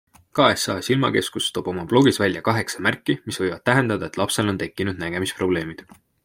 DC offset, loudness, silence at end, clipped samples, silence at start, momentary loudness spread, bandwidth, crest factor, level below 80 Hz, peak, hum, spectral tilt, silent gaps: under 0.1%; -22 LUFS; 0.4 s; under 0.1%; 0.35 s; 8 LU; 16.5 kHz; 22 dB; -56 dBFS; 0 dBFS; none; -4.5 dB/octave; none